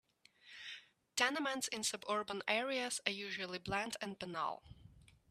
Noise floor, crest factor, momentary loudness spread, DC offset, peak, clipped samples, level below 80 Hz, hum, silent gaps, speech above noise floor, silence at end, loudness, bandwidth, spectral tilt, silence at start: -65 dBFS; 26 dB; 15 LU; under 0.1%; -14 dBFS; under 0.1%; -72 dBFS; none; none; 25 dB; 0.3 s; -39 LUFS; 15 kHz; -2 dB/octave; 0.45 s